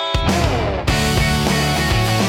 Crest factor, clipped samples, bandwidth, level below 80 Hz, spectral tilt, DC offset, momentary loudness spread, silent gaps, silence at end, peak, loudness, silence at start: 14 dB; under 0.1%; 17.5 kHz; -26 dBFS; -4.5 dB/octave; under 0.1%; 2 LU; none; 0 s; -2 dBFS; -17 LUFS; 0 s